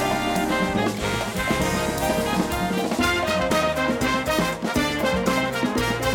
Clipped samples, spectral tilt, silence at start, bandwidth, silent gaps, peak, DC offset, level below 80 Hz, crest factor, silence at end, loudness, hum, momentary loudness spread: under 0.1%; -4.5 dB/octave; 0 s; 19.5 kHz; none; -8 dBFS; under 0.1%; -38 dBFS; 14 dB; 0 s; -23 LUFS; none; 3 LU